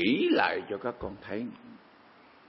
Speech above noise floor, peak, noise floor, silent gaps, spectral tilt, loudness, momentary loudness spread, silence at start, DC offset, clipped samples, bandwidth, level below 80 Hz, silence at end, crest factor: 27 dB; -10 dBFS; -57 dBFS; none; -9 dB/octave; -30 LUFS; 16 LU; 0 s; under 0.1%; under 0.1%; 5.8 kHz; -60 dBFS; 0.7 s; 22 dB